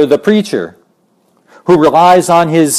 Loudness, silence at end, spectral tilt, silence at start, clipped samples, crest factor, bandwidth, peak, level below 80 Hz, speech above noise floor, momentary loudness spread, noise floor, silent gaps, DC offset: -9 LUFS; 0 s; -5 dB/octave; 0 s; 0.4%; 10 dB; 15 kHz; 0 dBFS; -50 dBFS; 46 dB; 14 LU; -55 dBFS; none; under 0.1%